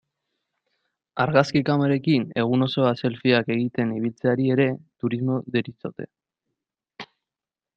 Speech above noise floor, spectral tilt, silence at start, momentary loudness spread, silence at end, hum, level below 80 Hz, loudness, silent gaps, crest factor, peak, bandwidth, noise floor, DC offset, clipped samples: over 68 dB; -7.5 dB/octave; 1.15 s; 17 LU; 0.7 s; none; -64 dBFS; -23 LUFS; none; 22 dB; -2 dBFS; 7.6 kHz; under -90 dBFS; under 0.1%; under 0.1%